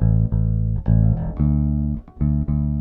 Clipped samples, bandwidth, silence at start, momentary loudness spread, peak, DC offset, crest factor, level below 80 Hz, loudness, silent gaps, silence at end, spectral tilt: under 0.1%; 2.3 kHz; 0 s; 5 LU; -4 dBFS; under 0.1%; 14 dB; -24 dBFS; -21 LUFS; none; 0 s; -14 dB/octave